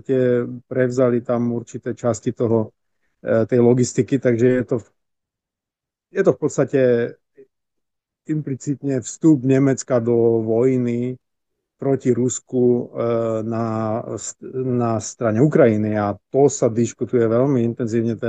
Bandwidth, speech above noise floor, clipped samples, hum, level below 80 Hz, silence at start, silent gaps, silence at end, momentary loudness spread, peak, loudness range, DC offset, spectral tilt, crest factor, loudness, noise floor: 9.2 kHz; 68 dB; under 0.1%; none; -64 dBFS; 0.1 s; none; 0 s; 10 LU; -2 dBFS; 4 LU; under 0.1%; -7 dB/octave; 18 dB; -20 LUFS; -87 dBFS